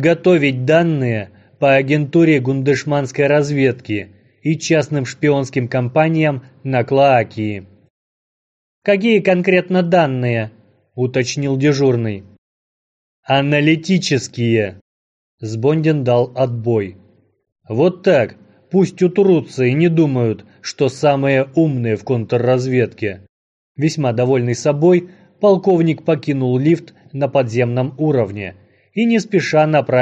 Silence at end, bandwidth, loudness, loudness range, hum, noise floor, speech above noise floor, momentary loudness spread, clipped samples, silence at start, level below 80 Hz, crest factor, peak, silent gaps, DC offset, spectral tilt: 0 s; 8.6 kHz; -16 LUFS; 3 LU; none; under -90 dBFS; over 75 dB; 11 LU; under 0.1%; 0 s; -58 dBFS; 16 dB; 0 dBFS; 7.90-8.82 s, 12.38-13.23 s, 14.81-15.38 s, 17.52-17.56 s, 23.29-23.75 s; under 0.1%; -6.5 dB/octave